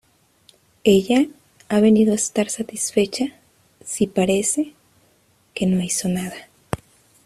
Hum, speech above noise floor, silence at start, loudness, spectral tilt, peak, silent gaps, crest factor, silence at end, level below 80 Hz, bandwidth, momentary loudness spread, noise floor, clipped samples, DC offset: none; 41 dB; 0.85 s; -20 LUFS; -4.5 dB/octave; -2 dBFS; none; 20 dB; 0.5 s; -54 dBFS; 14.5 kHz; 16 LU; -60 dBFS; under 0.1%; under 0.1%